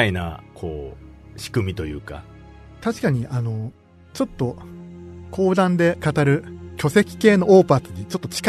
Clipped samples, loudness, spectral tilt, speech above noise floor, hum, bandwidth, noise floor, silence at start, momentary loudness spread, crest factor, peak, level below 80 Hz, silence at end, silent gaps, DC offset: under 0.1%; -20 LUFS; -6.5 dB/octave; 23 dB; none; 13.5 kHz; -43 dBFS; 0 s; 22 LU; 20 dB; -2 dBFS; -44 dBFS; 0 s; none; under 0.1%